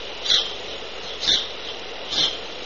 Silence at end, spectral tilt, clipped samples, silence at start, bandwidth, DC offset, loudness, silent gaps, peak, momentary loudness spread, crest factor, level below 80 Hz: 0 s; 1.5 dB/octave; under 0.1%; 0 s; 7.2 kHz; 1%; -22 LUFS; none; -6 dBFS; 13 LU; 20 dB; -50 dBFS